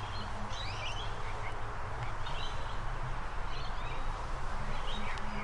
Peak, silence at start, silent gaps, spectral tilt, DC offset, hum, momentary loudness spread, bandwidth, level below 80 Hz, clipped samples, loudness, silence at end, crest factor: -24 dBFS; 0 s; none; -4.5 dB/octave; under 0.1%; none; 2 LU; 10.5 kHz; -38 dBFS; under 0.1%; -40 LUFS; 0 s; 12 dB